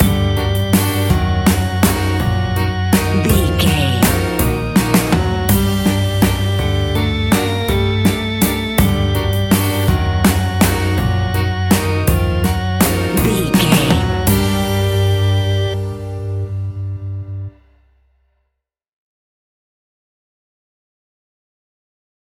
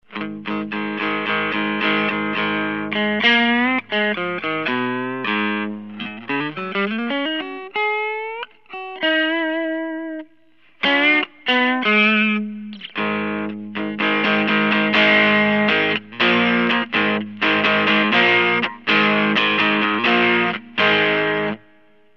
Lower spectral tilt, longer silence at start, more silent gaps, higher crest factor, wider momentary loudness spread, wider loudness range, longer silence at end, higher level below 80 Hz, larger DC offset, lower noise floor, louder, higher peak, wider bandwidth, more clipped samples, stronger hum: about the same, -5.5 dB/octave vs -6 dB/octave; about the same, 0 s vs 0.1 s; neither; about the same, 16 dB vs 18 dB; second, 8 LU vs 13 LU; about the same, 9 LU vs 7 LU; first, 4.85 s vs 0.6 s; first, -26 dBFS vs -74 dBFS; second, under 0.1% vs 0.2%; first, -74 dBFS vs -57 dBFS; about the same, -16 LUFS vs -18 LUFS; about the same, 0 dBFS vs -2 dBFS; first, 17 kHz vs 6.8 kHz; neither; neither